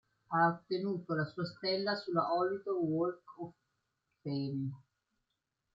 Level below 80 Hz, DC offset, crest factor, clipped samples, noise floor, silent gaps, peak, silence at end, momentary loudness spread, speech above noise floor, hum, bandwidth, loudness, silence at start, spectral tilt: -78 dBFS; under 0.1%; 18 dB; under 0.1%; -86 dBFS; none; -18 dBFS; 0.95 s; 16 LU; 51 dB; none; 7.6 kHz; -35 LUFS; 0.3 s; -8 dB/octave